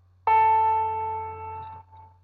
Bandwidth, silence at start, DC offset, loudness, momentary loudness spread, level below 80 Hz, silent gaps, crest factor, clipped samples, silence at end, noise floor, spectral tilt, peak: 4.3 kHz; 0.25 s; under 0.1%; -23 LUFS; 19 LU; -62 dBFS; none; 14 dB; under 0.1%; 0.2 s; -48 dBFS; -6.5 dB/octave; -12 dBFS